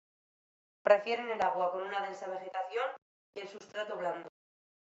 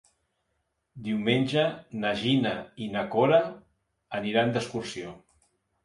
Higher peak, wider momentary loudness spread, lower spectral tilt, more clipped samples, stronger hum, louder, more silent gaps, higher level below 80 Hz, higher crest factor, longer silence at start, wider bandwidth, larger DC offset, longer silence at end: about the same, -10 dBFS vs -8 dBFS; first, 18 LU vs 14 LU; second, -4 dB/octave vs -6 dB/octave; neither; neither; second, -34 LUFS vs -27 LUFS; first, 3.02-3.33 s vs none; second, -82 dBFS vs -64 dBFS; about the same, 24 dB vs 20 dB; about the same, 0.85 s vs 0.95 s; second, 7.8 kHz vs 11.5 kHz; neither; about the same, 0.6 s vs 0.65 s